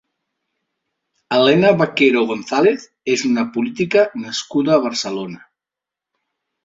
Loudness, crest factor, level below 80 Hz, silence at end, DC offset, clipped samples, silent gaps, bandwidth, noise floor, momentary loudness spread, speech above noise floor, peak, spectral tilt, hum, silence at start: -17 LUFS; 16 dB; -60 dBFS; 1.25 s; under 0.1%; under 0.1%; none; 7.8 kHz; -87 dBFS; 11 LU; 70 dB; -2 dBFS; -5 dB/octave; none; 1.3 s